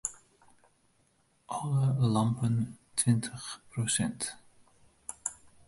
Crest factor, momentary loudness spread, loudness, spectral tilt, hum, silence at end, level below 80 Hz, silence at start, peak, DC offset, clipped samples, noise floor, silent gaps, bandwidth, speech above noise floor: 18 dB; 13 LU; -31 LUFS; -5 dB/octave; none; 0.35 s; -62 dBFS; 0.05 s; -14 dBFS; under 0.1%; under 0.1%; -70 dBFS; none; 11.5 kHz; 40 dB